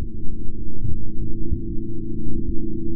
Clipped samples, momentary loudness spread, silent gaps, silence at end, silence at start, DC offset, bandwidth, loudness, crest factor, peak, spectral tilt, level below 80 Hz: under 0.1%; 5 LU; none; 0 s; 0 s; under 0.1%; 0.5 kHz; -31 LUFS; 8 dB; -6 dBFS; -17 dB/octave; -28 dBFS